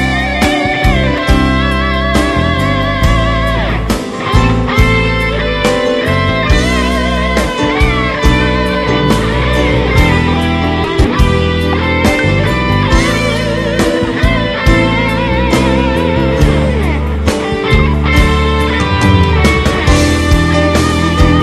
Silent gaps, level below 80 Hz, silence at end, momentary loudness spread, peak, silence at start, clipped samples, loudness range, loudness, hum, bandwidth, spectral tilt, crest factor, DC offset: none; -16 dBFS; 0 s; 3 LU; 0 dBFS; 0 s; 0.5%; 2 LU; -11 LUFS; none; 14.5 kHz; -6 dB/octave; 10 dB; under 0.1%